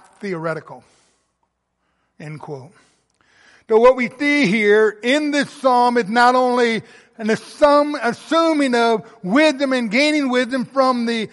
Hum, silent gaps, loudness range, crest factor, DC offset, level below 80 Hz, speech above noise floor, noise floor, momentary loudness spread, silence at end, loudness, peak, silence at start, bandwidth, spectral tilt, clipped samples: none; none; 6 LU; 16 dB; under 0.1%; -58 dBFS; 54 dB; -71 dBFS; 13 LU; 0.05 s; -17 LUFS; -2 dBFS; 0.2 s; 11.5 kHz; -4.5 dB/octave; under 0.1%